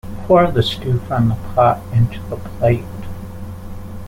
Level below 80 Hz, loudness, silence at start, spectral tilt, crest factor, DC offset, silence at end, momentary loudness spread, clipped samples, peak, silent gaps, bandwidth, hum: -36 dBFS; -17 LUFS; 0.05 s; -7.5 dB/octave; 16 dB; under 0.1%; 0 s; 18 LU; under 0.1%; -2 dBFS; none; 15.5 kHz; none